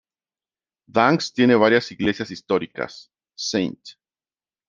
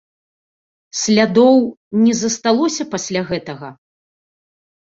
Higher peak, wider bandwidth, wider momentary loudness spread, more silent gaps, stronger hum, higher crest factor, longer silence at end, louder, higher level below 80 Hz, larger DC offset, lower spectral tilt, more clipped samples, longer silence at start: about the same, -2 dBFS vs -2 dBFS; about the same, 7.4 kHz vs 7.8 kHz; about the same, 14 LU vs 16 LU; second, none vs 1.77-1.91 s; neither; first, 22 dB vs 16 dB; second, 0.8 s vs 1.1 s; second, -21 LUFS vs -16 LUFS; about the same, -60 dBFS vs -58 dBFS; neither; about the same, -5 dB/octave vs -4 dB/octave; neither; about the same, 0.95 s vs 0.95 s